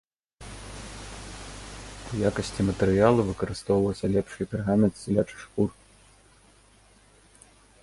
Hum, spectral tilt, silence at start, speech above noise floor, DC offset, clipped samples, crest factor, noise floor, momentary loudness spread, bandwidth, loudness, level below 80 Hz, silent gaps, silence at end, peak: none; -6.5 dB/octave; 0.4 s; 33 dB; under 0.1%; under 0.1%; 22 dB; -57 dBFS; 19 LU; 11.5 kHz; -26 LUFS; -46 dBFS; none; 2.15 s; -6 dBFS